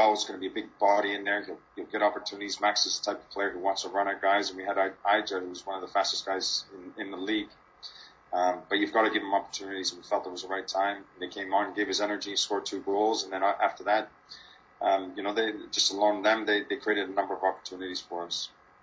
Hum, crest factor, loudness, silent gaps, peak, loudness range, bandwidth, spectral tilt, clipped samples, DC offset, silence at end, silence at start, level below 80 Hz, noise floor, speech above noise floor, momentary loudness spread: none; 20 dB; -29 LUFS; none; -10 dBFS; 3 LU; 7.8 kHz; -1.5 dB/octave; under 0.1%; under 0.1%; 0.35 s; 0 s; -72 dBFS; -49 dBFS; 19 dB; 12 LU